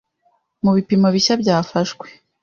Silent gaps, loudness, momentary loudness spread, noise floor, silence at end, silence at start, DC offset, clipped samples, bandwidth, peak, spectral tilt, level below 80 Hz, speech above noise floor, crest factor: none; -17 LUFS; 9 LU; -64 dBFS; 0.3 s; 0.65 s; under 0.1%; under 0.1%; 7.4 kHz; -4 dBFS; -5.5 dB/octave; -56 dBFS; 47 dB; 16 dB